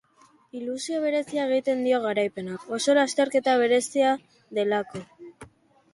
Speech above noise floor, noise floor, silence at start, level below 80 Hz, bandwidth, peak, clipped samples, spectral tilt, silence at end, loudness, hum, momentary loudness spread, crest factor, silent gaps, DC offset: 35 dB; -59 dBFS; 0.55 s; -70 dBFS; 11.5 kHz; -10 dBFS; under 0.1%; -3.5 dB/octave; 0.5 s; -25 LUFS; none; 13 LU; 16 dB; none; under 0.1%